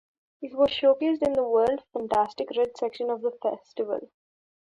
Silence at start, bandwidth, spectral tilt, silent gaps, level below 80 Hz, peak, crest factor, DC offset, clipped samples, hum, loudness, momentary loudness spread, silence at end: 0.4 s; 10.5 kHz; -5.5 dB/octave; none; -62 dBFS; -10 dBFS; 16 dB; under 0.1%; under 0.1%; none; -26 LUFS; 10 LU; 0.6 s